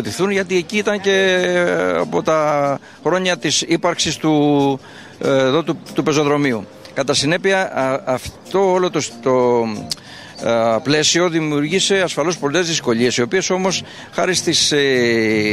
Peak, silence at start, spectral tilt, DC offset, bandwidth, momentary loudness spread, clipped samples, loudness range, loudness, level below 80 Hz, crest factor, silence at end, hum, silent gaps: -2 dBFS; 0 s; -3.5 dB/octave; 0.1%; 14 kHz; 8 LU; under 0.1%; 2 LU; -17 LUFS; -54 dBFS; 14 dB; 0 s; none; none